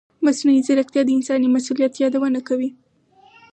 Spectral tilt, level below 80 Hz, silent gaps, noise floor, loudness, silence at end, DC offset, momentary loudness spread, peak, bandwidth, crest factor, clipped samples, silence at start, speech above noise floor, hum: -4 dB/octave; -74 dBFS; none; -54 dBFS; -19 LUFS; 0.85 s; under 0.1%; 6 LU; -6 dBFS; 9 kHz; 12 dB; under 0.1%; 0.2 s; 36 dB; none